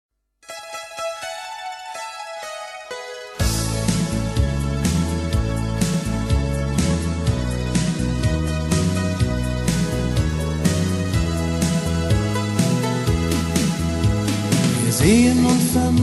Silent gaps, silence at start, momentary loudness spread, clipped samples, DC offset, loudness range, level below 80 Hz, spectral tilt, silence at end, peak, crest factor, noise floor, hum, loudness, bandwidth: none; 0.5 s; 14 LU; under 0.1%; under 0.1%; 7 LU; -30 dBFS; -5.5 dB/octave; 0 s; -2 dBFS; 18 dB; -40 dBFS; none; -21 LUFS; 13 kHz